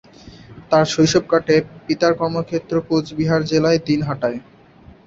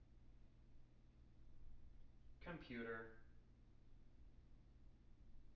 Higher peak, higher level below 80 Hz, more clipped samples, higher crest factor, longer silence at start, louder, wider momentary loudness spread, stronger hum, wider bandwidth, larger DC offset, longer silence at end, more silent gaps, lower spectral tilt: first, -2 dBFS vs -38 dBFS; first, -50 dBFS vs -68 dBFS; neither; about the same, 18 dB vs 20 dB; first, 0.25 s vs 0 s; first, -18 LUFS vs -54 LUFS; second, 8 LU vs 18 LU; neither; first, 7.8 kHz vs 6 kHz; neither; first, 0.65 s vs 0 s; neither; about the same, -5.5 dB/octave vs -5 dB/octave